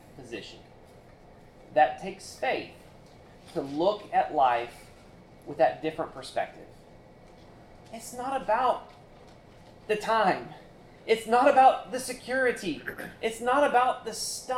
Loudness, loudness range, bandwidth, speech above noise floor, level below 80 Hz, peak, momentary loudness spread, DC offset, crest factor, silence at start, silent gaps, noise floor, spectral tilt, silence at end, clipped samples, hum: -27 LUFS; 8 LU; 16 kHz; 25 dB; -60 dBFS; -8 dBFS; 19 LU; under 0.1%; 20 dB; 0.15 s; none; -52 dBFS; -3.5 dB/octave; 0 s; under 0.1%; none